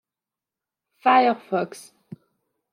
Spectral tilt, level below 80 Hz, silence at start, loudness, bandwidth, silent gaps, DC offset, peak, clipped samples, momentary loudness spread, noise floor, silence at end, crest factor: -5 dB/octave; -80 dBFS; 1.05 s; -21 LUFS; 13.5 kHz; none; under 0.1%; -4 dBFS; under 0.1%; 10 LU; -89 dBFS; 0.95 s; 20 dB